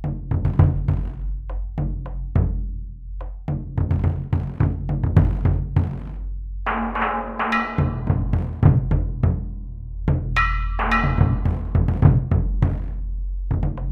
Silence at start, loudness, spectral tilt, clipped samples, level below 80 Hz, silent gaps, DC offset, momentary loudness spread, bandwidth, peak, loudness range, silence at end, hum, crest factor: 0 s; -22 LUFS; -9 dB/octave; under 0.1%; -26 dBFS; none; under 0.1%; 13 LU; 6 kHz; -2 dBFS; 4 LU; 0 s; none; 20 dB